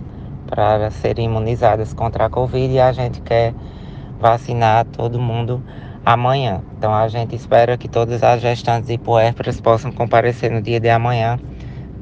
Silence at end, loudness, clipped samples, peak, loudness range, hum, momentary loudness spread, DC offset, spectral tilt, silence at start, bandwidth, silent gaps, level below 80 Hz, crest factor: 0 s; -17 LUFS; under 0.1%; 0 dBFS; 2 LU; none; 11 LU; under 0.1%; -7.5 dB/octave; 0 s; 7.6 kHz; none; -36 dBFS; 16 dB